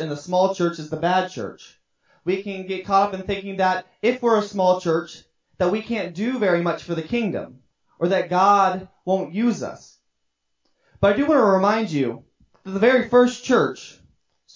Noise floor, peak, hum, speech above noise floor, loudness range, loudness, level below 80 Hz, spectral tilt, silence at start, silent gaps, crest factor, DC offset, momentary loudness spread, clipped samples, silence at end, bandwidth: -74 dBFS; -4 dBFS; none; 53 dB; 4 LU; -21 LUFS; -54 dBFS; -6 dB/octave; 0 s; none; 18 dB; under 0.1%; 14 LU; under 0.1%; 0.65 s; 7.6 kHz